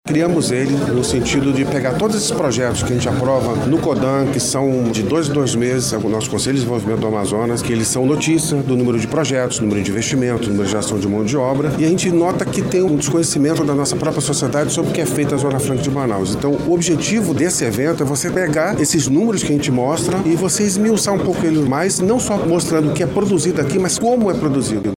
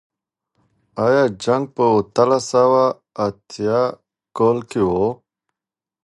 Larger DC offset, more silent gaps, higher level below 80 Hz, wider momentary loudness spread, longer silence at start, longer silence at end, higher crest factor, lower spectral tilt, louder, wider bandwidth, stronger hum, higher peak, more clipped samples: neither; neither; first, -42 dBFS vs -54 dBFS; second, 3 LU vs 9 LU; second, 0.05 s vs 0.95 s; second, 0 s vs 0.9 s; second, 12 dB vs 18 dB; about the same, -5 dB/octave vs -6 dB/octave; about the same, -17 LUFS vs -18 LUFS; first, 16.5 kHz vs 11.5 kHz; neither; about the same, -4 dBFS vs -2 dBFS; neither